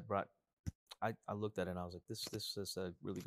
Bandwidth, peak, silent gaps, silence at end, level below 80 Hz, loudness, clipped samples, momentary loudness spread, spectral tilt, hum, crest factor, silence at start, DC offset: 15.5 kHz; -24 dBFS; 0.53-0.64 s, 0.75-0.87 s; 0 s; -66 dBFS; -45 LUFS; under 0.1%; 10 LU; -4.5 dB/octave; none; 20 dB; 0 s; under 0.1%